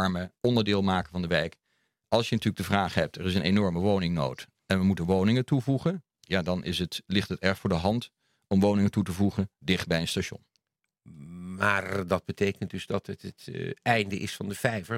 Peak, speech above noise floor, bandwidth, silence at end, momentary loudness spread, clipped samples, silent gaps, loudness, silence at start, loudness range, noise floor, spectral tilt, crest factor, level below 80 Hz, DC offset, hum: -6 dBFS; 54 dB; 15.5 kHz; 0 s; 11 LU; under 0.1%; none; -28 LUFS; 0 s; 4 LU; -81 dBFS; -6 dB/octave; 22 dB; -58 dBFS; under 0.1%; none